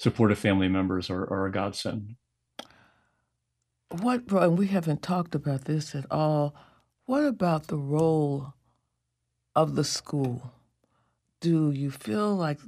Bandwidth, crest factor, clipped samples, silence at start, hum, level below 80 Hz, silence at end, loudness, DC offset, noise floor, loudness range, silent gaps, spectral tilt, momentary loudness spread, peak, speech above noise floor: 14.5 kHz; 20 dB; under 0.1%; 0 s; none; -62 dBFS; 0 s; -27 LUFS; under 0.1%; -80 dBFS; 4 LU; none; -6.5 dB/octave; 13 LU; -8 dBFS; 53 dB